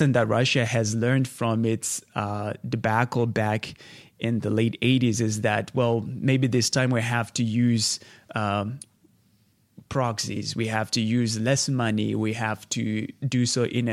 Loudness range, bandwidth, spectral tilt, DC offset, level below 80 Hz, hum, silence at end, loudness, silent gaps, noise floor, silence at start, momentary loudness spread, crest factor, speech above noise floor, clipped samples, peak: 4 LU; 14.5 kHz; -5 dB/octave; under 0.1%; -60 dBFS; none; 0 s; -25 LUFS; none; -64 dBFS; 0 s; 8 LU; 18 dB; 39 dB; under 0.1%; -6 dBFS